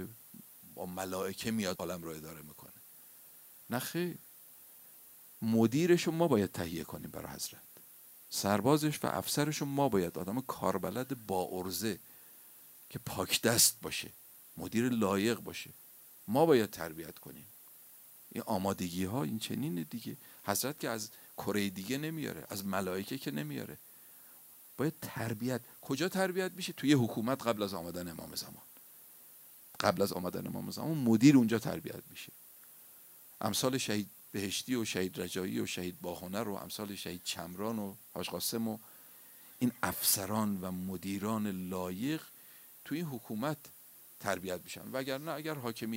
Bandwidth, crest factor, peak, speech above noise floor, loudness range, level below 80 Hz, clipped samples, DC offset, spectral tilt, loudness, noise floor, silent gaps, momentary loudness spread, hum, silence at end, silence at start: 16 kHz; 24 dB; -12 dBFS; 22 dB; 8 LU; -70 dBFS; under 0.1%; under 0.1%; -4.5 dB/octave; -34 LUFS; -56 dBFS; none; 23 LU; none; 0 s; 0 s